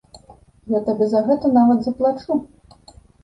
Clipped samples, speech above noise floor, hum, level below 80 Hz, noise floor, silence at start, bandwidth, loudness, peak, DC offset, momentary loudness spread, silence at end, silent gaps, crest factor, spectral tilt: under 0.1%; 31 dB; none; -54 dBFS; -49 dBFS; 0.15 s; 7.8 kHz; -19 LUFS; -4 dBFS; under 0.1%; 9 LU; 0.8 s; none; 16 dB; -8.5 dB/octave